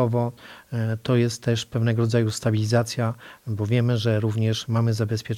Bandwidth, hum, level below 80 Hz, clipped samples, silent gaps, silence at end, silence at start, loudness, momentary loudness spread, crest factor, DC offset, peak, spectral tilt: 13.5 kHz; none; -58 dBFS; under 0.1%; none; 0 s; 0 s; -24 LUFS; 8 LU; 16 dB; under 0.1%; -8 dBFS; -6.5 dB/octave